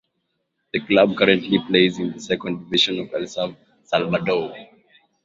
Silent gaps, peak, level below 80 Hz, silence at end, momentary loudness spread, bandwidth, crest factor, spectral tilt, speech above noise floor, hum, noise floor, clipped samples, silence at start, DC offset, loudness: none; -2 dBFS; -58 dBFS; 0.6 s; 12 LU; 7.8 kHz; 20 dB; -5 dB/octave; 54 dB; none; -74 dBFS; under 0.1%; 0.75 s; under 0.1%; -20 LUFS